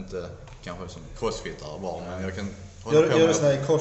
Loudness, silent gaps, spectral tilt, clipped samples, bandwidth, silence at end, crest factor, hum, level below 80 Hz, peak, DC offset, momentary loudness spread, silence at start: -25 LUFS; none; -5 dB/octave; under 0.1%; 8.2 kHz; 0 s; 18 dB; none; -48 dBFS; -8 dBFS; under 0.1%; 20 LU; 0 s